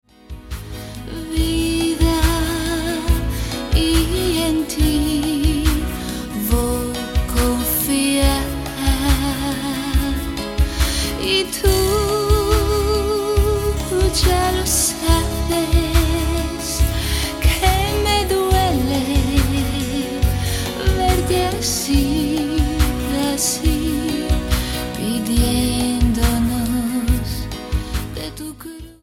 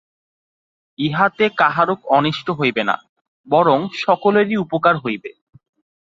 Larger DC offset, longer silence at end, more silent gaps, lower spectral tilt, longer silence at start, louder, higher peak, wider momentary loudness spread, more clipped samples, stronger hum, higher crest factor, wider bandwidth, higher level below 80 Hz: neither; second, 0.1 s vs 0.7 s; second, none vs 3.09-3.44 s; second, -4.5 dB/octave vs -7 dB/octave; second, 0.3 s vs 1 s; about the same, -19 LUFS vs -17 LUFS; about the same, -2 dBFS vs -2 dBFS; about the same, 8 LU vs 8 LU; neither; neither; about the same, 16 dB vs 18 dB; first, 17 kHz vs 7.6 kHz; first, -22 dBFS vs -60 dBFS